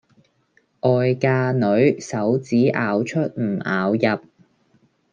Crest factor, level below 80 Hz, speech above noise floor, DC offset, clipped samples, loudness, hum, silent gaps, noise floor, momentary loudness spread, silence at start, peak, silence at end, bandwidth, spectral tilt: 16 dB; -66 dBFS; 44 dB; under 0.1%; under 0.1%; -20 LUFS; none; none; -63 dBFS; 6 LU; 0.85 s; -4 dBFS; 0.95 s; 8.8 kHz; -7 dB/octave